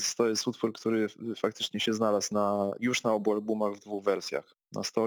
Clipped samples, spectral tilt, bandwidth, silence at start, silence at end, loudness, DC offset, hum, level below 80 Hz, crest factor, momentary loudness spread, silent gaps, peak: under 0.1%; -3.5 dB/octave; 19.5 kHz; 0 s; 0 s; -30 LUFS; under 0.1%; none; -74 dBFS; 16 dB; 6 LU; none; -14 dBFS